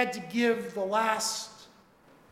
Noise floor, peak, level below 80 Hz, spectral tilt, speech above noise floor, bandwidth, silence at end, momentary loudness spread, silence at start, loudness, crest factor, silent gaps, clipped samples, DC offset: -59 dBFS; -10 dBFS; -74 dBFS; -2.5 dB/octave; 30 dB; 16.5 kHz; 0.65 s; 7 LU; 0 s; -29 LUFS; 20 dB; none; under 0.1%; under 0.1%